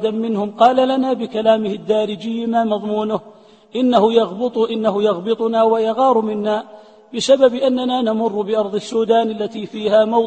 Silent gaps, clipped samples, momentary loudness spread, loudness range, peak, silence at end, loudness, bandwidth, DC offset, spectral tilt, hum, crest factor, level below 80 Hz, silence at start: none; under 0.1%; 9 LU; 2 LU; 0 dBFS; 0 s; -17 LUFS; 8.8 kHz; under 0.1%; -5.5 dB/octave; none; 16 dB; -62 dBFS; 0 s